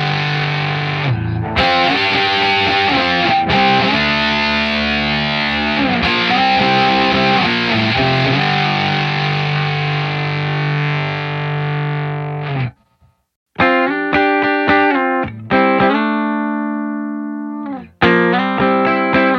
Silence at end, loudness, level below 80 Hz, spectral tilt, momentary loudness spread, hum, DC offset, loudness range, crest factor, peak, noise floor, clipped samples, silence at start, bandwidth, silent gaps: 0 s; -15 LUFS; -40 dBFS; -6 dB/octave; 8 LU; none; under 0.1%; 5 LU; 14 dB; 0 dBFS; -56 dBFS; under 0.1%; 0 s; 7 kHz; 13.36-13.46 s